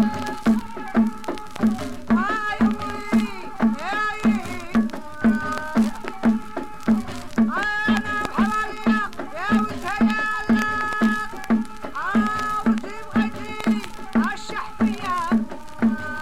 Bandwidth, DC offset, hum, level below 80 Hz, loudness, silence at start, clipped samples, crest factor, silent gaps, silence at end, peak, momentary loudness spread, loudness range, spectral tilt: 13.5 kHz; 2%; none; -46 dBFS; -23 LUFS; 0 s; under 0.1%; 18 dB; none; 0 s; -6 dBFS; 6 LU; 2 LU; -5.5 dB/octave